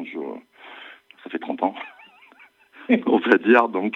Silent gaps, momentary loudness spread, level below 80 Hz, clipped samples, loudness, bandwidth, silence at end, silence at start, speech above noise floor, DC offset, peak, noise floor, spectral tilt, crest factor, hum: none; 25 LU; -82 dBFS; under 0.1%; -20 LUFS; 5.8 kHz; 0 s; 0 s; 34 dB; under 0.1%; -2 dBFS; -53 dBFS; -7 dB/octave; 22 dB; none